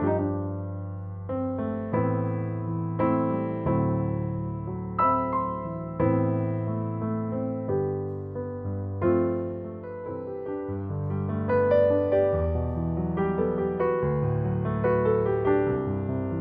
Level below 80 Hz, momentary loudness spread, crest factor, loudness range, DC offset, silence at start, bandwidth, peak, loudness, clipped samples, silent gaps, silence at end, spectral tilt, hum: -48 dBFS; 10 LU; 16 dB; 4 LU; under 0.1%; 0 s; 3.8 kHz; -10 dBFS; -27 LUFS; under 0.1%; none; 0 s; -13 dB/octave; none